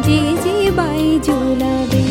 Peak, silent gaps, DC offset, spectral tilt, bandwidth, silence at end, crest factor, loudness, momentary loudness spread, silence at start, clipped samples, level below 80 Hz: -2 dBFS; none; under 0.1%; -6 dB/octave; 17 kHz; 0 s; 12 dB; -16 LUFS; 2 LU; 0 s; under 0.1%; -32 dBFS